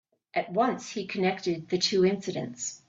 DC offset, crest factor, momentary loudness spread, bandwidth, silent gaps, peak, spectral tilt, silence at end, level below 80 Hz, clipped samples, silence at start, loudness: under 0.1%; 16 dB; 10 LU; 8 kHz; none; -14 dBFS; -4 dB/octave; 0.1 s; -68 dBFS; under 0.1%; 0.35 s; -28 LUFS